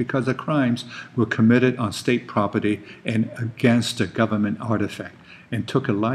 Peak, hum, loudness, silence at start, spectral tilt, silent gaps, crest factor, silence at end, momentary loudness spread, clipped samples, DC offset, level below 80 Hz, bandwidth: -4 dBFS; none; -22 LUFS; 0 s; -6.5 dB/octave; none; 18 dB; 0 s; 10 LU; under 0.1%; under 0.1%; -62 dBFS; 13.5 kHz